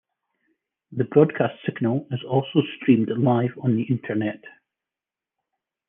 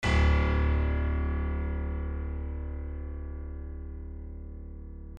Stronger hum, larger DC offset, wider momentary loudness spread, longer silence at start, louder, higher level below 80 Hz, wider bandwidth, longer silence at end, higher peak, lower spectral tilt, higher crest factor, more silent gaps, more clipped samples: neither; neither; second, 9 LU vs 18 LU; first, 0.9 s vs 0 s; first, -23 LUFS vs -31 LUFS; second, -72 dBFS vs -30 dBFS; second, 3.7 kHz vs 7.4 kHz; first, 1.4 s vs 0 s; first, -4 dBFS vs -14 dBFS; first, -11 dB/octave vs -7 dB/octave; about the same, 20 dB vs 16 dB; neither; neither